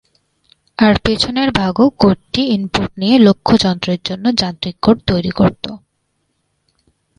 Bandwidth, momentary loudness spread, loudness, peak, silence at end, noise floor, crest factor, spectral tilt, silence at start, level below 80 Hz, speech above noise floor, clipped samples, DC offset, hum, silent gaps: 10.5 kHz; 9 LU; -14 LUFS; 0 dBFS; 1.4 s; -67 dBFS; 16 dB; -6 dB/octave; 0.8 s; -38 dBFS; 53 dB; under 0.1%; under 0.1%; none; none